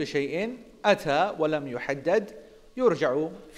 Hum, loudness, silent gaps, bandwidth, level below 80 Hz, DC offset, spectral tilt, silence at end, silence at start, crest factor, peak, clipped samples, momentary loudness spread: none; -27 LUFS; none; 13.5 kHz; -60 dBFS; under 0.1%; -5.5 dB/octave; 0 s; 0 s; 20 dB; -6 dBFS; under 0.1%; 8 LU